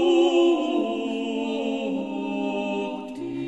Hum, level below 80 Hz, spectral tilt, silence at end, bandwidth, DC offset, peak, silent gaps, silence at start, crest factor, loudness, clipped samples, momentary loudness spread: none; -66 dBFS; -5.5 dB/octave; 0 s; 8.4 kHz; 0.1%; -10 dBFS; none; 0 s; 14 dB; -25 LUFS; under 0.1%; 10 LU